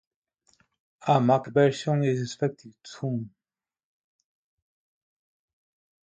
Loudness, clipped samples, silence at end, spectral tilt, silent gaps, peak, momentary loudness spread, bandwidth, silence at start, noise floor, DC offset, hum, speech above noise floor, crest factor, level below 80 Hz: -26 LUFS; under 0.1%; 2.8 s; -7 dB/octave; none; -8 dBFS; 18 LU; 9 kHz; 1.05 s; under -90 dBFS; under 0.1%; none; over 65 dB; 22 dB; -70 dBFS